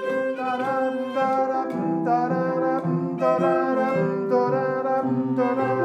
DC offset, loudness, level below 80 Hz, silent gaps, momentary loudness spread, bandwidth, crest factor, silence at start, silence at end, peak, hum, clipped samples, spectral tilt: under 0.1%; -23 LUFS; -80 dBFS; none; 4 LU; 8.8 kHz; 14 dB; 0 s; 0 s; -10 dBFS; none; under 0.1%; -8.5 dB/octave